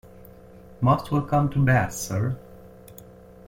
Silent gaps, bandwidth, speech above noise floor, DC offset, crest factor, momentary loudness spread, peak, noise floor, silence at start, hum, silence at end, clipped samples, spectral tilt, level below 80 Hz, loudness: none; 16.5 kHz; 25 dB; under 0.1%; 18 dB; 24 LU; -8 dBFS; -47 dBFS; 0.05 s; none; 0.45 s; under 0.1%; -6.5 dB/octave; -50 dBFS; -23 LUFS